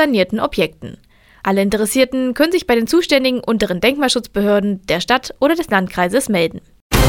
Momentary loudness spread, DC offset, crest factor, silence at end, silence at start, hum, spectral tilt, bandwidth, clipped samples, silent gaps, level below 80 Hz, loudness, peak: 5 LU; under 0.1%; 16 dB; 0 s; 0 s; none; -4.5 dB/octave; 18.5 kHz; under 0.1%; 6.81-6.90 s; -32 dBFS; -16 LUFS; 0 dBFS